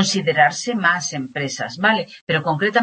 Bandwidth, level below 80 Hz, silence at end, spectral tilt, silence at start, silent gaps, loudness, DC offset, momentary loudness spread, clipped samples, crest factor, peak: 8.8 kHz; -66 dBFS; 0 s; -3.5 dB/octave; 0 s; 2.21-2.27 s; -19 LUFS; under 0.1%; 9 LU; under 0.1%; 18 dB; -2 dBFS